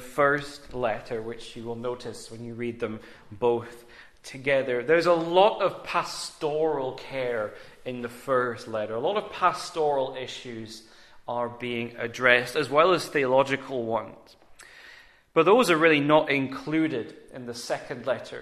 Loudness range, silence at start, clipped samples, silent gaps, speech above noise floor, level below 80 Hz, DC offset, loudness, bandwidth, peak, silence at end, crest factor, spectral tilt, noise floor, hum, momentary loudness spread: 7 LU; 0 s; under 0.1%; none; 26 dB; -62 dBFS; under 0.1%; -26 LUFS; 14 kHz; -4 dBFS; 0 s; 22 dB; -4.5 dB/octave; -52 dBFS; none; 18 LU